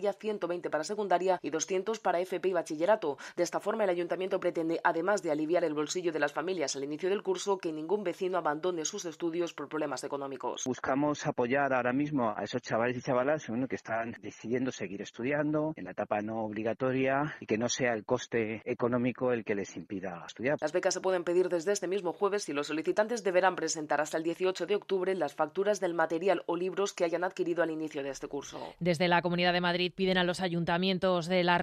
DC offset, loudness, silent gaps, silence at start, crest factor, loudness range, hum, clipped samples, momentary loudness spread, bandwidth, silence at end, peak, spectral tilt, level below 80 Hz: under 0.1%; -31 LUFS; none; 0 s; 20 dB; 3 LU; none; under 0.1%; 7 LU; 13 kHz; 0 s; -12 dBFS; -4.5 dB/octave; -70 dBFS